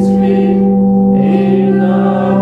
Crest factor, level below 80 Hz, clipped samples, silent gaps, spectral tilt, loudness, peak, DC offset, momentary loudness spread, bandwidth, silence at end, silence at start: 10 dB; -40 dBFS; under 0.1%; none; -10 dB/octave; -11 LUFS; 0 dBFS; under 0.1%; 1 LU; 4.5 kHz; 0 s; 0 s